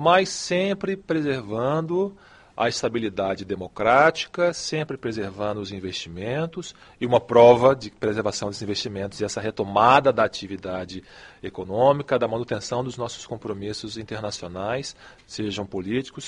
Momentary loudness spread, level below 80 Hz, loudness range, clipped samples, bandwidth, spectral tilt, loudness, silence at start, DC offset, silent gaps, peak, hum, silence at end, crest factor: 15 LU; -56 dBFS; 7 LU; under 0.1%; 11 kHz; -5 dB/octave; -23 LUFS; 0 s; under 0.1%; none; -2 dBFS; none; 0 s; 22 dB